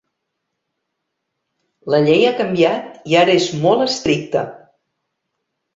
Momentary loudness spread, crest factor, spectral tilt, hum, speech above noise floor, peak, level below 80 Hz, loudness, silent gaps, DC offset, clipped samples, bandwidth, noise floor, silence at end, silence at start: 10 LU; 18 dB; -5 dB/octave; none; 60 dB; -2 dBFS; -56 dBFS; -16 LUFS; none; under 0.1%; under 0.1%; 8 kHz; -76 dBFS; 1.2 s; 1.85 s